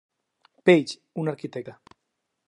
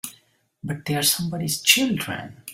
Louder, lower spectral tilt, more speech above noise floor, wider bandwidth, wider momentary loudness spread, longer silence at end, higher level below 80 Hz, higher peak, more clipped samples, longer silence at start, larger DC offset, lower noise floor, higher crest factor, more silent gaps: second, -24 LUFS vs -21 LUFS; first, -6.5 dB/octave vs -2.5 dB/octave; first, 56 dB vs 36 dB; second, 11 kHz vs 16.5 kHz; about the same, 18 LU vs 16 LU; first, 0.75 s vs 0 s; second, -76 dBFS vs -60 dBFS; about the same, -4 dBFS vs -2 dBFS; neither; first, 0.65 s vs 0.05 s; neither; first, -80 dBFS vs -59 dBFS; about the same, 22 dB vs 22 dB; neither